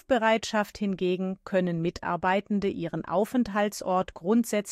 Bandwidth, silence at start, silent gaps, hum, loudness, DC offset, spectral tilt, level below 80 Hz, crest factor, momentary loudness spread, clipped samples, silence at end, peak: 15.5 kHz; 0.1 s; none; none; -27 LUFS; under 0.1%; -5.5 dB/octave; -58 dBFS; 16 dB; 6 LU; under 0.1%; 0 s; -12 dBFS